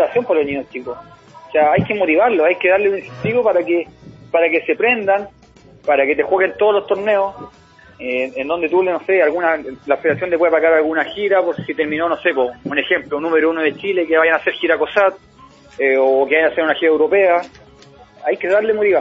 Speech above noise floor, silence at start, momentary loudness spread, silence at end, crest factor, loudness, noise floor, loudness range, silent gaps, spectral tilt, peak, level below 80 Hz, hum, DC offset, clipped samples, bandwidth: 28 dB; 0 s; 8 LU; 0 s; 16 dB; -16 LUFS; -44 dBFS; 2 LU; none; -7 dB/octave; 0 dBFS; -56 dBFS; none; under 0.1%; under 0.1%; 7.2 kHz